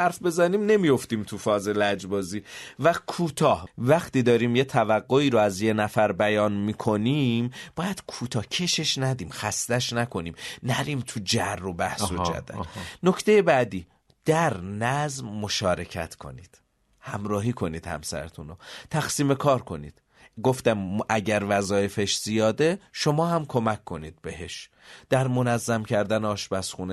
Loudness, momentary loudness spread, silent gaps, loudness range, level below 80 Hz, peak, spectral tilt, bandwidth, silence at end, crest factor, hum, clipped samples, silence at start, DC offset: -25 LUFS; 14 LU; none; 6 LU; -56 dBFS; -6 dBFS; -5 dB/octave; 12.5 kHz; 0 s; 20 dB; none; under 0.1%; 0 s; under 0.1%